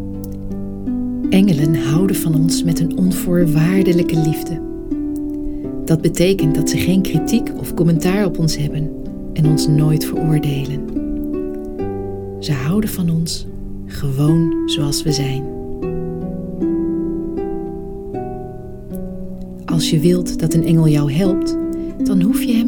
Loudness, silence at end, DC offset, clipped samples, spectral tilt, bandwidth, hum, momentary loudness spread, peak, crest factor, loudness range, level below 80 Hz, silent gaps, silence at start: -18 LUFS; 0 s; under 0.1%; under 0.1%; -6.5 dB/octave; 20 kHz; none; 13 LU; -2 dBFS; 16 dB; 6 LU; -32 dBFS; none; 0 s